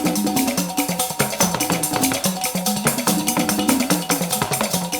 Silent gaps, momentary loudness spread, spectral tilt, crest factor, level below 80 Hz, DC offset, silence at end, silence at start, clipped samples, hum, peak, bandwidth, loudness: none; 2 LU; -3 dB/octave; 18 dB; -52 dBFS; under 0.1%; 0 s; 0 s; under 0.1%; none; -2 dBFS; over 20 kHz; -19 LUFS